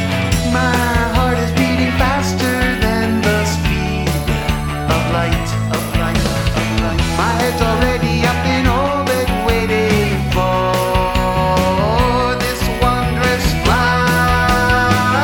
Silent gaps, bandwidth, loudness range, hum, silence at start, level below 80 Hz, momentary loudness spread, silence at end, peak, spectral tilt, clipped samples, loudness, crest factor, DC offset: none; 19.5 kHz; 2 LU; none; 0 s; -24 dBFS; 4 LU; 0 s; 0 dBFS; -5 dB/octave; under 0.1%; -15 LUFS; 14 dB; under 0.1%